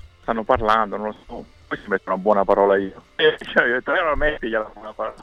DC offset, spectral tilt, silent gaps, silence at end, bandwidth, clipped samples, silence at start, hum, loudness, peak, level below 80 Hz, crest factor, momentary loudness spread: under 0.1%; -6 dB/octave; none; 0 s; 9.2 kHz; under 0.1%; 0.05 s; none; -20 LUFS; -4 dBFS; -38 dBFS; 18 dB; 15 LU